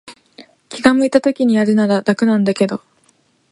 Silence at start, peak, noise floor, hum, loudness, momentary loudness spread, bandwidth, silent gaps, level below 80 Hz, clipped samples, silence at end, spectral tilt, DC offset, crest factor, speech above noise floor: 0.05 s; 0 dBFS; -58 dBFS; none; -15 LUFS; 6 LU; 11.5 kHz; none; -58 dBFS; under 0.1%; 0.75 s; -6 dB/octave; under 0.1%; 16 dB; 44 dB